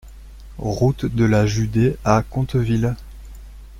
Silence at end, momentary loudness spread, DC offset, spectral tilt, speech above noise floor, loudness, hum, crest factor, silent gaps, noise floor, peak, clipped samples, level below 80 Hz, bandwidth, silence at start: 0 s; 11 LU; under 0.1%; -7 dB/octave; 20 dB; -20 LUFS; none; 18 dB; none; -38 dBFS; -2 dBFS; under 0.1%; -36 dBFS; 14.5 kHz; 0.05 s